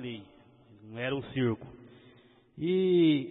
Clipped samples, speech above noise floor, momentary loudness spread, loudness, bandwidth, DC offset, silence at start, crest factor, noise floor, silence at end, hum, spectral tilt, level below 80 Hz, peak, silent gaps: under 0.1%; 31 dB; 22 LU; -29 LUFS; 4.1 kHz; under 0.1%; 0 s; 16 dB; -60 dBFS; 0 s; none; -10.5 dB/octave; -66 dBFS; -16 dBFS; none